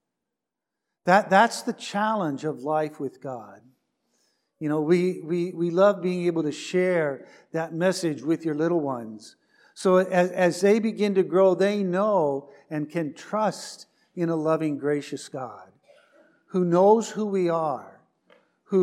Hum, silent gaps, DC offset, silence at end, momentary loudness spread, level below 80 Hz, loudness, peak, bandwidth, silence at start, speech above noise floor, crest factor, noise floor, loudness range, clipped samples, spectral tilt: none; none; under 0.1%; 0 s; 15 LU; -84 dBFS; -24 LUFS; -4 dBFS; 13.5 kHz; 1.05 s; 62 dB; 20 dB; -86 dBFS; 6 LU; under 0.1%; -6 dB/octave